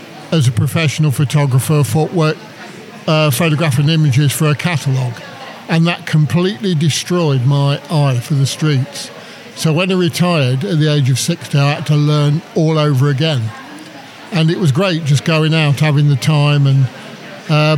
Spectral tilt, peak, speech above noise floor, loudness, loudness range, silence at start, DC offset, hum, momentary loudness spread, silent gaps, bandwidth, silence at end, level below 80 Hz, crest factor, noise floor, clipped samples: -6 dB/octave; -2 dBFS; 20 dB; -14 LUFS; 2 LU; 0 s; under 0.1%; none; 14 LU; none; 15 kHz; 0 s; -60 dBFS; 12 dB; -33 dBFS; under 0.1%